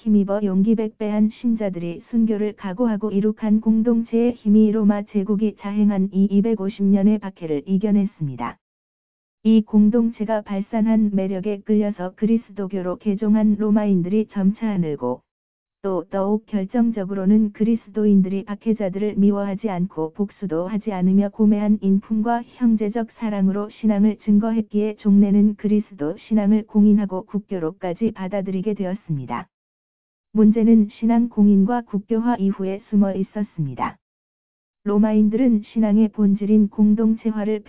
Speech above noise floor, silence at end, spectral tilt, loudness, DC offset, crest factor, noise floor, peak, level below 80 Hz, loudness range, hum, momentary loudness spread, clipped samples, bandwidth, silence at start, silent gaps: over 71 dB; 0 s; -13 dB/octave; -20 LUFS; 0.7%; 14 dB; under -90 dBFS; -6 dBFS; -58 dBFS; 3 LU; none; 10 LU; under 0.1%; 3.9 kHz; 0 s; 8.61-9.38 s, 15.31-15.66 s, 29.54-30.24 s, 34.02-34.74 s